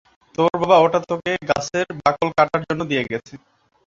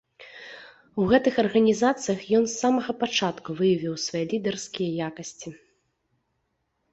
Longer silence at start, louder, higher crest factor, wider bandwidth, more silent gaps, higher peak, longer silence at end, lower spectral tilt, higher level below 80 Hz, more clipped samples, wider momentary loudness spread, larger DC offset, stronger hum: first, 0.4 s vs 0.2 s; first, -19 LUFS vs -24 LUFS; about the same, 18 dB vs 20 dB; about the same, 7.8 kHz vs 8.2 kHz; neither; first, -2 dBFS vs -6 dBFS; second, 0.5 s vs 1.35 s; about the same, -5 dB/octave vs -4.5 dB/octave; first, -54 dBFS vs -60 dBFS; neither; second, 9 LU vs 20 LU; neither; neither